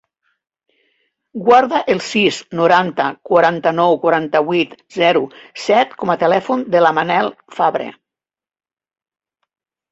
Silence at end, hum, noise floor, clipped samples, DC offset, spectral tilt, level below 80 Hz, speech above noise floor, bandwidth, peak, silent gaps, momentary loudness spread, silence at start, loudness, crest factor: 2 s; none; under -90 dBFS; under 0.1%; under 0.1%; -5 dB/octave; -62 dBFS; over 75 dB; 8 kHz; 0 dBFS; none; 9 LU; 1.35 s; -15 LUFS; 16 dB